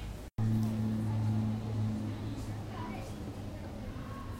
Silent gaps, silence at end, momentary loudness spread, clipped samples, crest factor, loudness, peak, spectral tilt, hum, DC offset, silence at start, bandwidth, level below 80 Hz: none; 0 s; 11 LU; under 0.1%; 14 dB; -36 LUFS; -22 dBFS; -8 dB/octave; none; under 0.1%; 0 s; 15 kHz; -48 dBFS